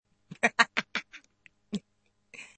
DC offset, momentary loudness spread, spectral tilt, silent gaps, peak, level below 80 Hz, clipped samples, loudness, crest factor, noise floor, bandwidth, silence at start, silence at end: under 0.1%; 20 LU; -2.5 dB/octave; none; -4 dBFS; -74 dBFS; under 0.1%; -29 LUFS; 30 dB; -74 dBFS; 8.8 kHz; 0.3 s; 0.1 s